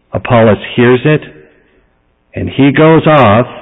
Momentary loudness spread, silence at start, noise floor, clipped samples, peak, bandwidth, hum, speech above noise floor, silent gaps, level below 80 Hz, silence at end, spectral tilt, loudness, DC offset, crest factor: 11 LU; 0.15 s; -54 dBFS; under 0.1%; 0 dBFS; 4 kHz; none; 47 dB; none; -36 dBFS; 0 s; -10 dB/octave; -8 LUFS; under 0.1%; 10 dB